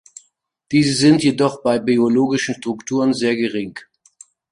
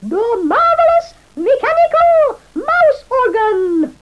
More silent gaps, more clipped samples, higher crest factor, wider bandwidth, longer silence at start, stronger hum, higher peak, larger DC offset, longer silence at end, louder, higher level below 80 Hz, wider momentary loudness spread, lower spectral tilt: neither; neither; first, 16 dB vs 10 dB; about the same, 11.5 kHz vs 11 kHz; first, 0.7 s vs 0 s; neither; about the same, -2 dBFS vs -2 dBFS; second, under 0.1% vs 0.2%; first, 0.7 s vs 0.1 s; second, -17 LUFS vs -13 LUFS; second, -56 dBFS vs -48 dBFS; first, 11 LU vs 7 LU; about the same, -5 dB/octave vs -5.5 dB/octave